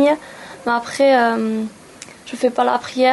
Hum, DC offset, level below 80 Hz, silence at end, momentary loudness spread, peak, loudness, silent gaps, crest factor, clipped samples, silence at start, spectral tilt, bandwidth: none; under 0.1%; -62 dBFS; 0 s; 22 LU; -4 dBFS; -18 LUFS; none; 14 dB; under 0.1%; 0 s; -4 dB/octave; 11.5 kHz